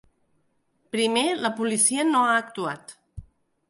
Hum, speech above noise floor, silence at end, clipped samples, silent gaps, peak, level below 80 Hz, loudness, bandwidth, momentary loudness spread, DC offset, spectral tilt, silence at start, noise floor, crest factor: none; 45 dB; 0.5 s; under 0.1%; none; -6 dBFS; -58 dBFS; -23 LUFS; 11.5 kHz; 12 LU; under 0.1%; -2 dB/octave; 0.95 s; -69 dBFS; 20 dB